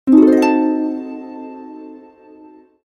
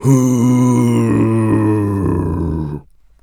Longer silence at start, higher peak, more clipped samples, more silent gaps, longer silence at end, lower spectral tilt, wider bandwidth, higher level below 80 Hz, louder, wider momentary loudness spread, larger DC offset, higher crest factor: about the same, 0.05 s vs 0 s; about the same, 0 dBFS vs 0 dBFS; neither; neither; first, 0.9 s vs 0.4 s; second, -6 dB/octave vs -8 dB/octave; second, 10 kHz vs 15.5 kHz; second, -60 dBFS vs -36 dBFS; about the same, -14 LUFS vs -14 LUFS; first, 24 LU vs 9 LU; neither; about the same, 16 dB vs 14 dB